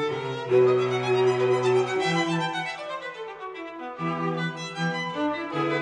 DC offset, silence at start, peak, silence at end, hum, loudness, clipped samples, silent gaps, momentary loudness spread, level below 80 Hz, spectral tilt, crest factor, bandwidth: under 0.1%; 0 s; -10 dBFS; 0 s; none; -25 LUFS; under 0.1%; none; 15 LU; -70 dBFS; -6 dB/octave; 16 dB; 10 kHz